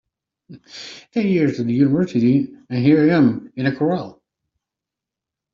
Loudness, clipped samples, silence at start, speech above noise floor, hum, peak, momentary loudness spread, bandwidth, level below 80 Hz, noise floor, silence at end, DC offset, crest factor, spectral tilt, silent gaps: -18 LUFS; under 0.1%; 0.5 s; 68 dB; none; -4 dBFS; 20 LU; 7.2 kHz; -60 dBFS; -86 dBFS; 1.4 s; under 0.1%; 16 dB; -8 dB/octave; none